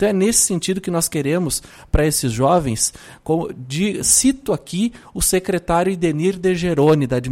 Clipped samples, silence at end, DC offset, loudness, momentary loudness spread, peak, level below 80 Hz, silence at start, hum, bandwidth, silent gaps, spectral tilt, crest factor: under 0.1%; 0 s; under 0.1%; -18 LUFS; 9 LU; -2 dBFS; -34 dBFS; 0 s; none; 16.5 kHz; none; -4 dB/octave; 16 dB